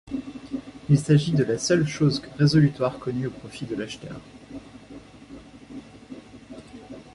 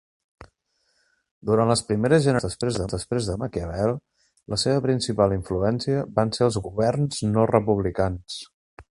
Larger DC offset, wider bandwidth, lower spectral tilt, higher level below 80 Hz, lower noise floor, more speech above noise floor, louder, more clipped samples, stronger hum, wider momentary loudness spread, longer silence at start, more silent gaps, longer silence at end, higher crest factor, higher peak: neither; about the same, 11.5 kHz vs 11.5 kHz; about the same, -6.5 dB/octave vs -6 dB/octave; second, -54 dBFS vs -44 dBFS; second, -45 dBFS vs -71 dBFS; second, 22 dB vs 48 dB; about the same, -24 LUFS vs -23 LUFS; neither; neither; first, 25 LU vs 9 LU; second, 0.05 s vs 0.4 s; second, none vs 1.31-1.41 s, 8.53-8.77 s; about the same, 0.1 s vs 0.1 s; about the same, 20 dB vs 22 dB; second, -6 dBFS vs -2 dBFS